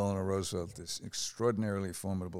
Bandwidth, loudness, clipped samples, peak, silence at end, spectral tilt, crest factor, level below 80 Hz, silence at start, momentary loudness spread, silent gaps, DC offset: 16 kHz; -35 LUFS; under 0.1%; -18 dBFS; 0 s; -5 dB/octave; 16 dB; -62 dBFS; 0 s; 7 LU; none; under 0.1%